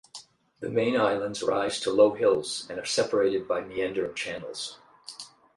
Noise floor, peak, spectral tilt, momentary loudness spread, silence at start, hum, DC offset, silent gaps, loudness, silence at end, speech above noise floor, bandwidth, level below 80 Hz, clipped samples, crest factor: -50 dBFS; -8 dBFS; -3.5 dB/octave; 20 LU; 0.15 s; none; under 0.1%; none; -27 LUFS; 0.3 s; 23 dB; 11.5 kHz; -66 dBFS; under 0.1%; 20 dB